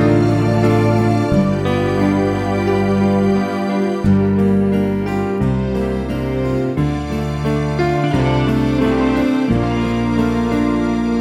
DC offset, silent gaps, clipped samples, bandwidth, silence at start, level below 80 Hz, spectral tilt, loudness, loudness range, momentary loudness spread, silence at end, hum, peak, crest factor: under 0.1%; none; under 0.1%; 13.5 kHz; 0 s; -32 dBFS; -8 dB/octave; -17 LUFS; 3 LU; 5 LU; 0 s; none; -2 dBFS; 14 dB